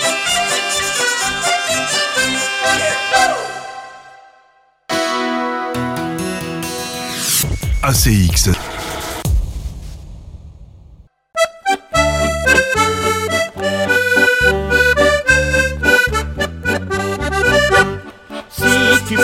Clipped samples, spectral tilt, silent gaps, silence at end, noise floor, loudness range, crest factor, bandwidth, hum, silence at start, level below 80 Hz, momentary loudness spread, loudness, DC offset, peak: under 0.1%; -3 dB/octave; none; 0 s; -53 dBFS; 8 LU; 16 dB; 16.5 kHz; none; 0 s; -28 dBFS; 12 LU; -15 LUFS; under 0.1%; 0 dBFS